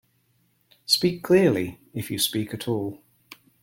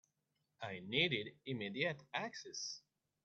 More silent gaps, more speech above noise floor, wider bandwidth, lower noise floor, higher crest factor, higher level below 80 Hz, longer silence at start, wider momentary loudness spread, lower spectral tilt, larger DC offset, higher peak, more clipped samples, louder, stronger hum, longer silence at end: neither; about the same, 44 dB vs 44 dB; first, 17 kHz vs 8.2 kHz; second, -67 dBFS vs -85 dBFS; about the same, 20 dB vs 22 dB; first, -62 dBFS vs -80 dBFS; first, 0.9 s vs 0.6 s; about the same, 15 LU vs 13 LU; about the same, -4.5 dB/octave vs -3.5 dB/octave; neither; first, -6 dBFS vs -20 dBFS; neither; first, -24 LUFS vs -41 LUFS; neither; first, 0.65 s vs 0.45 s